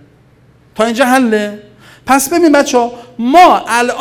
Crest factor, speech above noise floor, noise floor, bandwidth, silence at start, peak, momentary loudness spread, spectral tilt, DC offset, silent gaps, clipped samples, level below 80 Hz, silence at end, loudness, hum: 12 dB; 36 dB; -46 dBFS; 19 kHz; 0.75 s; 0 dBFS; 13 LU; -3 dB/octave; under 0.1%; none; 0.7%; -48 dBFS; 0 s; -10 LUFS; none